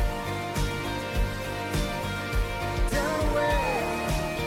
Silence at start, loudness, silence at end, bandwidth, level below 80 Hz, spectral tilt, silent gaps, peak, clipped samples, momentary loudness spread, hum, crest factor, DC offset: 0 s; -28 LUFS; 0 s; 16.5 kHz; -32 dBFS; -5 dB/octave; none; -16 dBFS; under 0.1%; 6 LU; none; 12 dB; under 0.1%